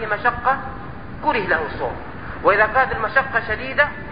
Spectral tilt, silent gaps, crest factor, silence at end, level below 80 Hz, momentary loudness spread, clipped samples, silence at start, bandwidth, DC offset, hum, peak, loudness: -10 dB/octave; none; 18 dB; 0 s; -40 dBFS; 16 LU; under 0.1%; 0 s; 5.2 kHz; 1%; none; -2 dBFS; -20 LUFS